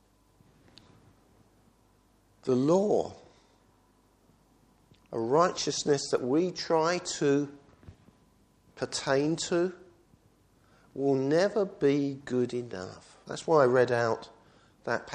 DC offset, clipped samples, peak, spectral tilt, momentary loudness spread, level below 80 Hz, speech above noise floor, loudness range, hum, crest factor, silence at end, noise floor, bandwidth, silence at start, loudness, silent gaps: under 0.1%; under 0.1%; -10 dBFS; -5 dB/octave; 15 LU; -68 dBFS; 37 dB; 4 LU; none; 20 dB; 0 s; -65 dBFS; 10.5 kHz; 2.45 s; -28 LUFS; none